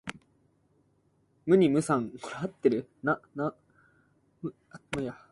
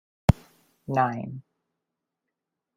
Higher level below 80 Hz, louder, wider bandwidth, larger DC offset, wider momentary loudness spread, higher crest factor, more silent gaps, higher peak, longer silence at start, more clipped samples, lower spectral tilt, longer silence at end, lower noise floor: second, -66 dBFS vs -42 dBFS; about the same, -29 LUFS vs -27 LUFS; second, 11.5 kHz vs 16 kHz; neither; about the same, 18 LU vs 18 LU; about the same, 22 dB vs 26 dB; neither; second, -10 dBFS vs -2 dBFS; second, 0.05 s vs 0.3 s; neither; second, -6.5 dB/octave vs -8 dB/octave; second, 0.2 s vs 1.35 s; second, -69 dBFS vs -85 dBFS